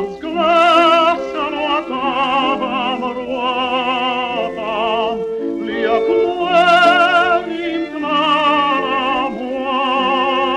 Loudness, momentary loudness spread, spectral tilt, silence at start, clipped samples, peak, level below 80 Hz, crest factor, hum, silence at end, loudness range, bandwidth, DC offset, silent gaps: -16 LUFS; 11 LU; -4.5 dB/octave; 0 s; under 0.1%; -2 dBFS; -52 dBFS; 14 dB; none; 0 s; 4 LU; 11 kHz; under 0.1%; none